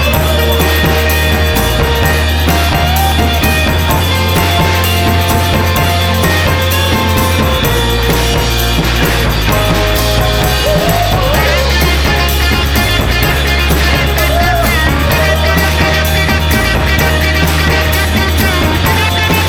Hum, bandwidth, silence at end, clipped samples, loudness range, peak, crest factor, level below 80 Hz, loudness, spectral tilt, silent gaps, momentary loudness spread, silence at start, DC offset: none; over 20 kHz; 0 s; under 0.1%; 1 LU; 0 dBFS; 10 dB; -16 dBFS; -11 LUFS; -4.5 dB/octave; none; 1 LU; 0 s; under 0.1%